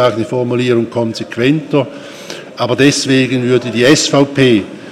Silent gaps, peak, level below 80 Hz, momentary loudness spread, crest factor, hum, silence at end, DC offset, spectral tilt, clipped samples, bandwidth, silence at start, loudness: none; 0 dBFS; -52 dBFS; 12 LU; 12 dB; none; 0 s; under 0.1%; -5 dB/octave; under 0.1%; 14.5 kHz; 0 s; -12 LUFS